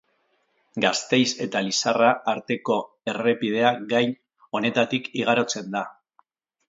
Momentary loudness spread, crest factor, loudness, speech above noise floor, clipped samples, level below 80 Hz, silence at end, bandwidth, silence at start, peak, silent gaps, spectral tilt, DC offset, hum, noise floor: 10 LU; 22 dB; -23 LUFS; 46 dB; under 0.1%; -72 dBFS; 0.75 s; 7.8 kHz; 0.75 s; -4 dBFS; none; -3.5 dB/octave; under 0.1%; none; -69 dBFS